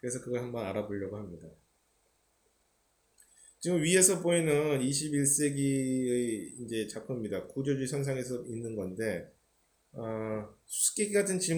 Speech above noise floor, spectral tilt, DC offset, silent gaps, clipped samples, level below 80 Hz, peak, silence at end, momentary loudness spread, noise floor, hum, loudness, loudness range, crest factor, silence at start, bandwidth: 42 dB; -4 dB/octave; under 0.1%; none; under 0.1%; -68 dBFS; -8 dBFS; 0 s; 12 LU; -73 dBFS; none; -31 LUFS; 11 LU; 24 dB; 0.05 s; over 20 kHz